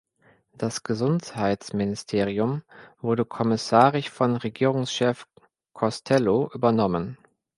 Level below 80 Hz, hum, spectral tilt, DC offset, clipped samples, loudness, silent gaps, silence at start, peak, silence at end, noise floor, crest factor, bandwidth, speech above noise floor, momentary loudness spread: -58 dBFS; none; -6 dB/octave; under 0.1%; under 0.1%; -24 LUFS; none; 0.6 s; -4 dBFS; 0.45 s; -62 dBFS; 22 dB; 11.5 kHz; 38 dB; 9 LU